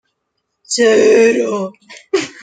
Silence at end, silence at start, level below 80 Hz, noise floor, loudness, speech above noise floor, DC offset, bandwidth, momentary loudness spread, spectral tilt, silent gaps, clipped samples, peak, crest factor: 0.1 s; 0.7 s; -64 dBFS; -72 dBFS; -13 LUFS; 60 dB; under 0.1%; 9.4 kHz; 12 LU; -3 dB/octave; none; under 0.1%; 0 dBFS; 14 dB